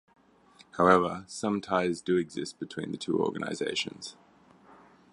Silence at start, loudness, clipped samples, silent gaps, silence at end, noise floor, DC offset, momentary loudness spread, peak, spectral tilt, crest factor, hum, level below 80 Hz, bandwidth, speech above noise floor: 0.75 s; -29 LUFS; under 0.1%; none; 1 s; -59 dBFS; under 0.1%; 15 LU; -6 dBFS; -5 dB/octave; 24 dB; none; -64 dBFS; 11.5 kHz; 30 dB